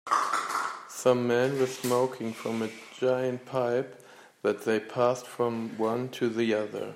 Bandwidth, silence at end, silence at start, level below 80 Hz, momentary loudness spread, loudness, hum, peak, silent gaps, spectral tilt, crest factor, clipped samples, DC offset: 16 kHz; 0 s; 0.05 s; -78 dBFS; 7 LU; -29 LUFS; none; -12 dBFS; none; -5 dB/octave; 18 dB; under 0.1%; under 0.1%